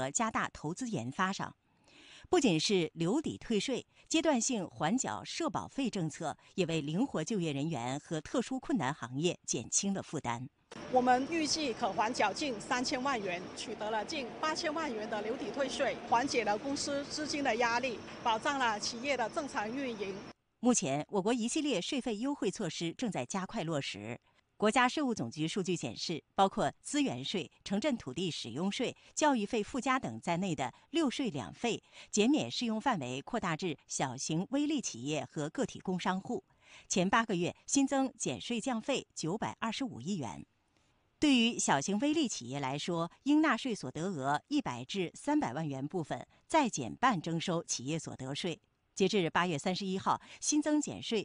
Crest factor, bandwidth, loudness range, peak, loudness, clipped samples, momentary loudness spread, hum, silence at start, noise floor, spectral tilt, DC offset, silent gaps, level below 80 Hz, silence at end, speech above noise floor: 18 dB; 10 kHz; 3 LU; -16 dBFS; -34 LUFS; under 0.1%; 8 LU; none; 0 s; -73 dBFS; -4 dB/octave; under 0.1%; none; -66 dBFS; 0 s; 39 dB